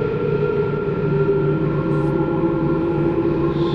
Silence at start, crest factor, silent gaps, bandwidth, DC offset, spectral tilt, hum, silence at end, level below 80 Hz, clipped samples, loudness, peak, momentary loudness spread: 0 s; 12 dB; none; 5.4 kHz; under 0.1%; -10.5 dB/octave; none; 0 s; -38 dBFS; under 0.1%; -20 LUFS; -6 dBFS; 2 LU